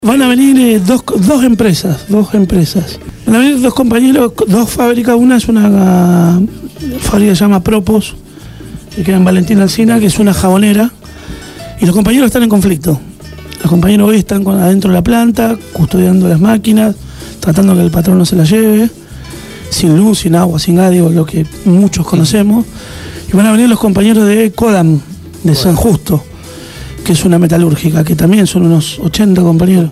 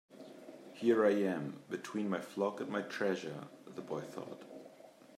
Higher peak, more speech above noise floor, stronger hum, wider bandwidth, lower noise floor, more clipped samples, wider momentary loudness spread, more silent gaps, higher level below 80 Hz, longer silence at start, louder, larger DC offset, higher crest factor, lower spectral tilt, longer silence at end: first, 0 dBFS vs -18 dBFS; about the same, 21 dB vs 22 dB; neither; first, 16 kHz vs 14.5 kHz; second, -29 dBFS vs -58 dBFS; neither; second, 15 LU vs 23 LU; neither; first, -30 dBFS vs -88 dBFS; about the same, 0 s vs 0.1 s; first, -9 LUFS vs -36 LUFS; first, 0.2% vs under 0.1%; second, 8 dB vs 20 dB; about the same, -6 dB/octave vs -6 dB/octave; about the same, 0 s vs 0 s